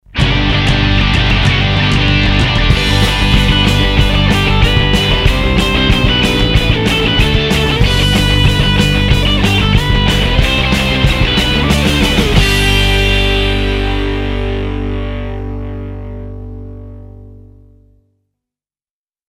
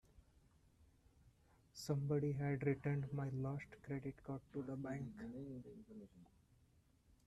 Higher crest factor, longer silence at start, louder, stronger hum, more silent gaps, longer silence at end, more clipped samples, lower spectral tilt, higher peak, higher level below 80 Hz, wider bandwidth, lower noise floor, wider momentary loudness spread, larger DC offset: second, 12 dB vs 20 dB; about the same, 0.15 s vs 0.15 s; first, -11 LUFS vs -44 LUFS; neither; neither; first, 1.95 s vs 1 s; neither; second, -5 dB/octave vs -7.5 dB/octave; first, 0 dBFS vs -26 dBFS; first, -18 dBFS vs -70 dBFS; first, 16 kHz vs 13 kHz; first, under -90 dBFS vs -73 dBFS; second, 11 LU vs 18 LU; neither